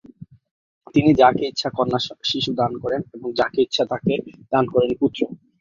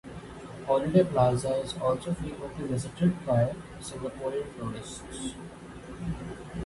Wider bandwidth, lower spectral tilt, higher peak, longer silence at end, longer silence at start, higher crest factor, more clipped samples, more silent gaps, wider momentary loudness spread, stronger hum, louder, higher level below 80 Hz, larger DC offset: second, 7.4 kHz vs 11.5 kHz; about the same, -6 dB/octave vs -6.5 dB/octave; first, -2 dBFS vs -10 dBFS; first, 0.25 s vs 0 s; first, 0.2 s vs 0.05 s; about the same, 18 dB vs 20 dB; neither; first, 0.51-0.81 s vs none; second, 11 LU vs 18 LU; neither; first, -21 LUFS vs -30 LUFS; about the same, -54 dBFS vs -50 dBFS; neither